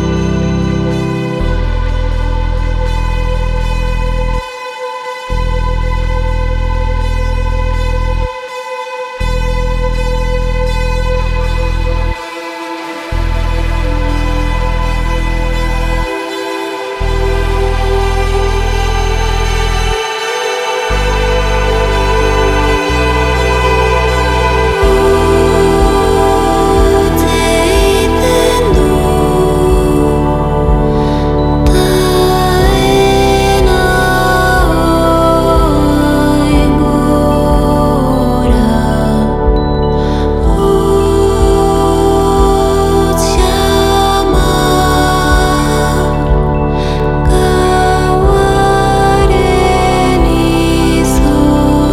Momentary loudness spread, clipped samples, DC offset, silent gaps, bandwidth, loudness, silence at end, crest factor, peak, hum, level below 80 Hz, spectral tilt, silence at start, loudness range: 7 LU; under 0.1%; under 0.1%; none; 15 kHz; -12 LUFS; 0 s; 10 dB; 0 dBFS; none; -16 dBFS; -5.5 dB/octave; 0 s; 7 LU